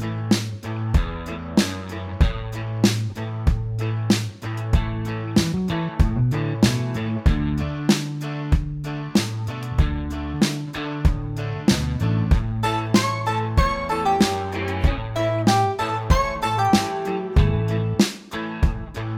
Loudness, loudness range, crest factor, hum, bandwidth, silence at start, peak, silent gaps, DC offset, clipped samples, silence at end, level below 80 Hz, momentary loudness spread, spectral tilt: -23 LUFS; 3 LU; 18 dB; none; 16 kHz; 0 s; -4 dBFS; none; under 0.1%; under 0.1%; 0 s; -28 dBFS; 9 LU; -6 dB/octave